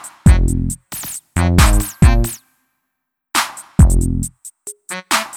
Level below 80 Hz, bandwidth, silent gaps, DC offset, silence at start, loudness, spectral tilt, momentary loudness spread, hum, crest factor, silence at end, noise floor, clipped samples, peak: -18 dBFS; 18.5 kHz; none; under 0.1%; 0.05 s; -16 LUFS; -4.5 dB/octave; 15 LU; none; 16 dB; 0 s; -76 dBFS; under 0.1%; 0 dBFS